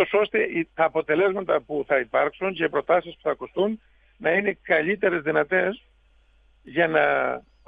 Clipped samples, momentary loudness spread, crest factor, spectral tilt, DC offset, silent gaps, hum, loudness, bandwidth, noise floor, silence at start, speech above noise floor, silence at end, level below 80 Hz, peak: under 0.1%; 7 LU; 18 dB; -8 dB/octave; under 0.1%; none; none; -23 LUFS; 4.8 kHz; -59 dBFS; 0 s; 35 dB; 0.3 s; -60 dBFS; -6 dBFS